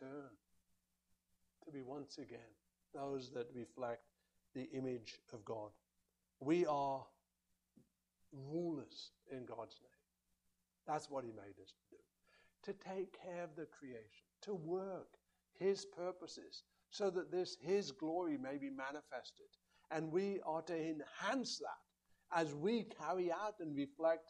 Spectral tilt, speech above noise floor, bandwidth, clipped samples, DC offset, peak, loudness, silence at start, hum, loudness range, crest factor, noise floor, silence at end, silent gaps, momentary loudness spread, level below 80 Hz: -5.5 dB/octave; 42 dB; 11 kHz; under 0.1%; under 0.1%; -22 dBFS; -44 LUFS; 0 s; none; 9 LU; 24 dB; -86 dBFS; 0.05 s; none; 16 LU; -86 dBFS